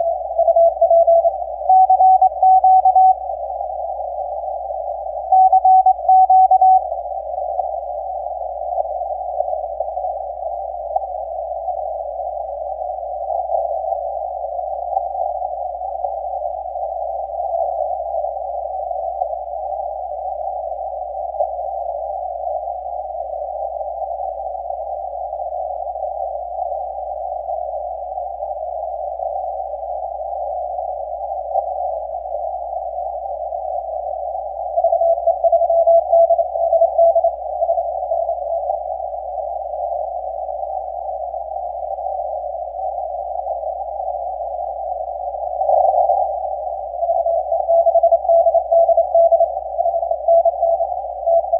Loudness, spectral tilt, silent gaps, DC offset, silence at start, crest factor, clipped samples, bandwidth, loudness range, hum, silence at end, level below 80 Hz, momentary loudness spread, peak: -19 LUFS; -9.5 dB/octave; none; under 0.1%; 0 s; 14 dB; under 0.1%; 1.1 kHz; 11 LU; none; 0 s; -48 dBFS; 13 LU; -4 dBFS